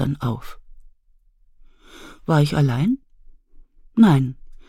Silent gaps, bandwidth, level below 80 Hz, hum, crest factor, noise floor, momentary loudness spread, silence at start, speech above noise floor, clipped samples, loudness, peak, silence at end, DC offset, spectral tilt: none; 14 kHz; -44 dBFS; none; 18 dB; -57 dBFS; 13 LU; 0 s; 39 dB; under 0.1%; -20 LUFS; -4 dBFS; 0.15 s; under 0.1%; -8 dB/octave